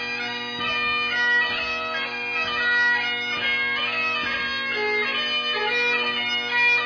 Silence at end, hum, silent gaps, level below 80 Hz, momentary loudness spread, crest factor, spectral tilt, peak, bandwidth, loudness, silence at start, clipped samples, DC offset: 0 s; none; none; -58 dBFS; 6 LU; 14 dB; -2 dB/octave; -10 dBFS; 5.4 kHz; -22 LUFS; 0 s; under 0.1%; under 0.1%